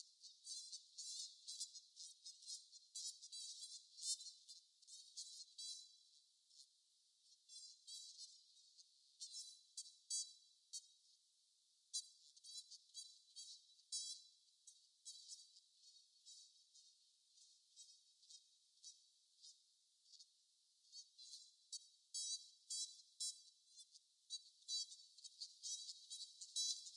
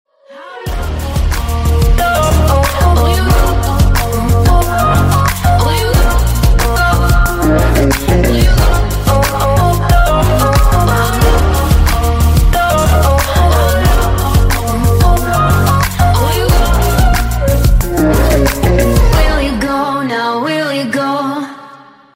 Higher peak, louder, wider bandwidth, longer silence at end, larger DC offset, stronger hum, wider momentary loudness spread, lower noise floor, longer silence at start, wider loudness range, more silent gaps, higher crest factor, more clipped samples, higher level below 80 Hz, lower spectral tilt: second, -30 dBFS vs 0 dBFS; second, -52 LUFS vs -12 LUFS; second, 12 kHz vs 16.5 kHz; second, 0 s vs 0.4 s; neither; neither; first, 20 LU vs 5 LU; first, -79 dBFS vs -37 dBFS; second, 0 s vs 0.3 s; first, 14 LU vs 2 LU; neither; first, 26 dB vs 10 dB; neither; second, under -90 dBFS vs -14 dBFS; second, 7.5 dB/octave vs -5.5 dB/octave